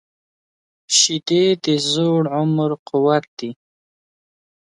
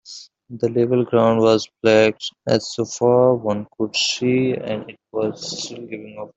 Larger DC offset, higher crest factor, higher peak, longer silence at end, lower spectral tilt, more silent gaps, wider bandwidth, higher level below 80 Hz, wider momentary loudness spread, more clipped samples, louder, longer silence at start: neither; about the same, 18 dB vs 16 dB; about the same, -2 dBFS vs -2 dBFS; first, 1.15 s vs 0.1 s; about the same, -4 dB/octave vs -5 dB/octave; first, 2.79-2.86 s, 3.28-3.37 s vs none; first, 11.5 kHz vs 8.2 kHz; second, -68 dBFS vs -60 dBFS; second, 9 LU vs 15 LU; neither; about the same, -17 LUFS vs -19 LUFS; first, 0.9 s vs 0.05 s